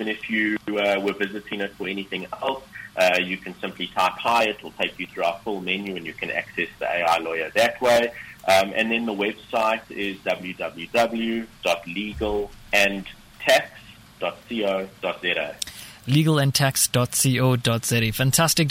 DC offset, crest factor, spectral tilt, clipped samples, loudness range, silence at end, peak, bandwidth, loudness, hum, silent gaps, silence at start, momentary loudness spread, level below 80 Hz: under 0.1%; 22 dB; -4 dB/octave; under 0.1%; 4 LU; 0 s; -2 dBFS; 17 kHz; -23 LUFS; none; none; 0 s; 11 LU; -52 dBFS